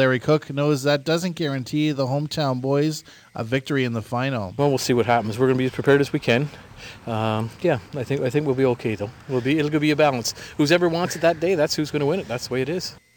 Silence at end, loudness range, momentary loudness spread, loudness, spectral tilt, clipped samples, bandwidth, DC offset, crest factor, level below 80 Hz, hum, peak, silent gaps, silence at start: 0.2 s; 3 LU; 8 LU; -22 LUFS; -5.5 dB/octave; under 0.1%; 19 kHz; under 0.1%; 18 dB; -56 dBFS; none; -4 dBFS; none; 0 s